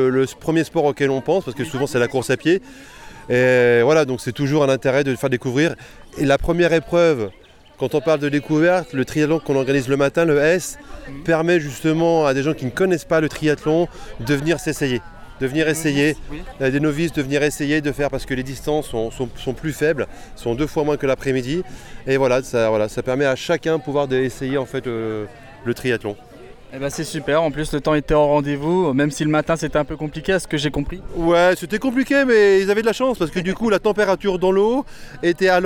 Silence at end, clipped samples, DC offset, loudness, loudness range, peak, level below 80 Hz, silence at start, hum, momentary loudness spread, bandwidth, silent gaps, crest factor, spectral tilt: 0 s; under 0.1%; under 0.1%; -19 LUFS; 5 LU; -4 dBFS; -40 dBFS; 0 s; none; 10 LU; 18.5 kHz; none; 14 dB; -5.5 dB/octave